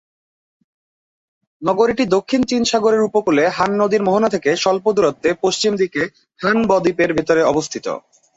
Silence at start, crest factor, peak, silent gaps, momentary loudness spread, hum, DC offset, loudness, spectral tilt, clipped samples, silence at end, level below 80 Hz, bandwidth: 1.6 s; 16 dB; -2 dBFS; none; 8 LU; none; under 0.1%; -17 LUFS; -4.5 dB/octave; under 0.1%; 0.4 s; -54 dBFS; 8 kHz